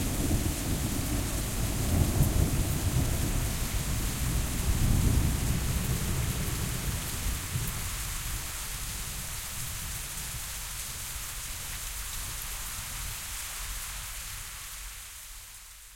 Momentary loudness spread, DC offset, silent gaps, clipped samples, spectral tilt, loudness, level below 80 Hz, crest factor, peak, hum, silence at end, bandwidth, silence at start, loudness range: 9 LU; under 0.1%; none; under 0.1%; -4 dB/octave; -32 LUFS; -36 dBFS; 20 dB; -12 dBFS; none; 0 s; 16.5 kHz; 0 s; 6 LU